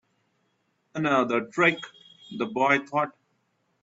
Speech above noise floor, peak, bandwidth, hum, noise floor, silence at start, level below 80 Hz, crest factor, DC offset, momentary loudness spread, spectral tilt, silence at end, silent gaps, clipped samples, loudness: 47 dB; -6 dBFS; 8 kHz; none; -72 dBFS; 0.95 s; -74 dBFS; 22 dB; under 0.1%; 16 LU; -5.5 dB/octave; 0.75 s; none; under 0.1%; -25 LUFS